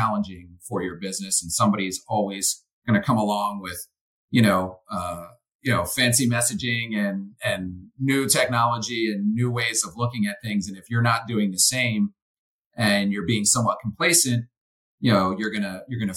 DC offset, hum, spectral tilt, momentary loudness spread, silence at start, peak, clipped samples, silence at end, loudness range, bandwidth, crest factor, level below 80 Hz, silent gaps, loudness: under 0.1%; none; -3.5 dB/octave; 12 LU; 0 s; -4 dBFS; under 0.1%; 0 s; 3 LU; 17 kHz; 20 dB; -58 dBFS; 2.73-2.82 s, 4.01-4.28 s, 5.54-5.59 s, 12.22-12.71 s, 14.58-14.98 s; -23 LUFS